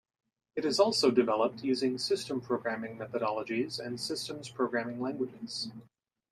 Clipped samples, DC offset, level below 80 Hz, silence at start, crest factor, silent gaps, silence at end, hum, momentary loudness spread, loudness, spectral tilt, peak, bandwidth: under 0.1%; under 0.1%; -76 dBFS; 0.55 s; 20 dB; none; 0.5 s; none; 11 LU; -32 LUFS; -4 dB/octave; -12 dBFS; 13.5 kHz